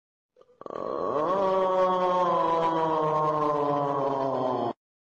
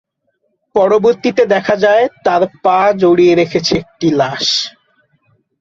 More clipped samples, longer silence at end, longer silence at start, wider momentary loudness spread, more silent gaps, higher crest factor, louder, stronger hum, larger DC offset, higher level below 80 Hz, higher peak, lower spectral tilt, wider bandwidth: neither; second, 0.4 s vs 0.9 s; about the same, 0.7 s vs 0.75 s; first, 9 LU vs 6 LU; neither; about the same, 12 dB vs 12 dB; second, -26 LUFS vs -12 LUFS; neither; neither; second, -66 dBFS vs -50 dBFS; second, -14 dBFS vs 0 dBFS; first, -7 dB/octave vs -4.5 dB/octave; about the same, 7.6 kHz vs 7.8 kHz